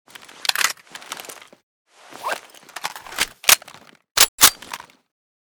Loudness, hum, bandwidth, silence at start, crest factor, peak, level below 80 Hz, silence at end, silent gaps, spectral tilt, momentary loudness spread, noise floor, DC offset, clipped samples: -17 LUFS; none; over 20 kHz; 0.5 s; 24 dB; 0 dBFS; -56 dBFS; 0.75 s; 1.63-1.85 s, 4.11-4.15 s, 4.28-4.38 s; 2 dB/octave; 21 LU; -46 dBFS; under 0.1%; under 0.1%